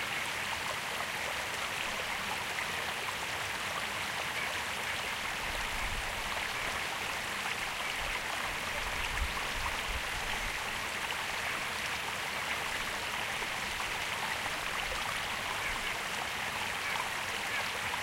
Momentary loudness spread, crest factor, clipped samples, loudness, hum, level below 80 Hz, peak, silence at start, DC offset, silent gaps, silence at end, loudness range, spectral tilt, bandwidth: 1 LU; 16 dB; under 0.1%; -34 LUFS; none; -50 dBFS; -18 dBFS; 0 s; under 0.1%; none; 0 s; 0 LU; -1.5 dB/octave; 16 kHz